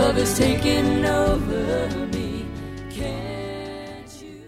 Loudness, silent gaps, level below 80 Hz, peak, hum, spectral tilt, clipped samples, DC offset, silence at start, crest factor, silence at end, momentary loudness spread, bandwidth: -23 LUFS; none; -34 dBFS; -6 dBFS; none; -5 dB/octave; under 0.1%; under 0.1%; 0 s; 16 dB; 0 s; 15 LU; 16 kHz